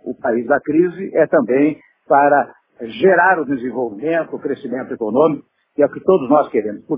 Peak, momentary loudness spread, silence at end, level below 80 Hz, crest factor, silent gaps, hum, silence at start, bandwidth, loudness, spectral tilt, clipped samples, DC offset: 0 dBFS; 12 LU; 0 s; -62 dBFS; 16 dB; none; none; 0.05 s; 3.8 kHz; -16 LUFS; -5.5 dB/octave; under 0.1%; under 0.1%